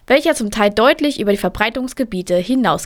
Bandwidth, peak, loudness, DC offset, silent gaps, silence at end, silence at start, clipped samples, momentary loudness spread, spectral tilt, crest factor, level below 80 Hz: 19.5 kHz; 0 dBFS; -16 LUFS; under 0.1%; none; 0 s; 0.1 s; under 0.1%; 8 LU; -4.5 dB/octave; 16 dB; -42 dBFS